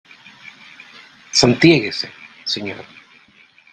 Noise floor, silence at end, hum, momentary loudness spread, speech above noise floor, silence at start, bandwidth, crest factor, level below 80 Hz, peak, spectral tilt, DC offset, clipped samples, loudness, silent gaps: -51 dBFS; 0.9 s; none; 27 LU; 34 dB; 1.35 s; 9.4 kHz; 20 dB; -52 dBFS; 0 dBFS; -4 dB/octave; under 0.1%; under 0.1%; -16 LUFS; none